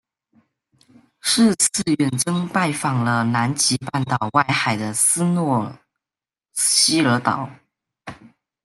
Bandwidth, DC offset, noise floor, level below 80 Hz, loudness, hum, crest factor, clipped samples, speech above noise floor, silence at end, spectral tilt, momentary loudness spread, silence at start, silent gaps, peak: 12.5 kHz; under 0.1%; under -90 dBFS; -60 dBFS; -19 LUFS; none; 18 dB; under 0.1%; over 71 dB; 0.4 s; -3.5 dB/octave; 12 LU; 1.25 s; none; -2 dBFS